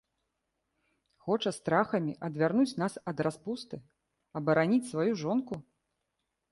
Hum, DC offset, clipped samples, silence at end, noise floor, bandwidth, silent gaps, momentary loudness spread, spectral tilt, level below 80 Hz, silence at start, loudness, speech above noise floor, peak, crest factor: none; under 0.1%; under 0.1%; 0.9 s; -83 dBFS; 11.5 kHz; none; 15 LU; -6.5 dB/octave; -72 dBFS; 1.25 s; -31 LUFS; 53 dB; -12 dBFS; 20 dB